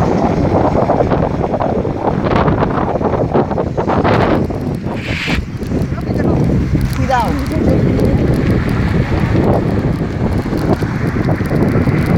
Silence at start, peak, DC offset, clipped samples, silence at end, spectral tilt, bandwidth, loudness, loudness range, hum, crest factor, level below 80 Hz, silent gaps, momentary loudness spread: 0 s; 0 dBFS; under 0.1%; under 0.1%; 0 s; -8 dB/octave; 16.5 kHz; -15 LUFS; 2 LU; none; 14 dB; -24 dBFS; none; 5 LU